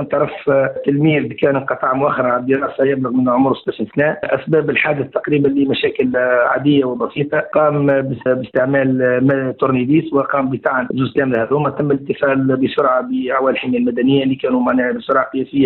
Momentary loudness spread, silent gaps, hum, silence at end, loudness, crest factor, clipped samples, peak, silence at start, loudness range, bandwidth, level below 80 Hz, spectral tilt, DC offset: 4 LU; none; none; 0 s; -16 LUFS; 12 dB; under 0.1%; -4 dBFS; 0 s; 1 LU; 4.3 kHz; -54 dBFS; -10 dB/octave; under 0.1%